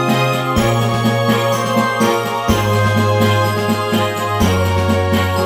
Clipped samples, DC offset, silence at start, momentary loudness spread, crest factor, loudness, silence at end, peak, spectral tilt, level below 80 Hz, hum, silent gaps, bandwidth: under 0.1%; under 0.1%; 0 s; 2 LU; 14 dB; -15 LUFS; 0 s; 0 dBFS; -5.5 dB/octave; -36 dBFS; none; none; over 20 kHz